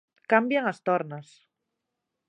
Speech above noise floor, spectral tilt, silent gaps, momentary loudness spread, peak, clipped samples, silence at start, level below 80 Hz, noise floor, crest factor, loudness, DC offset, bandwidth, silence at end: 58 dB; -6.5 dB/octave; none; 15 LU; -6 dBFS; under 0.1%; 0.3 s; -82 dBFS; -83 dBFS; 24 dB; -25 LUFS; under 0.1%; 10 kHz; 1.05 s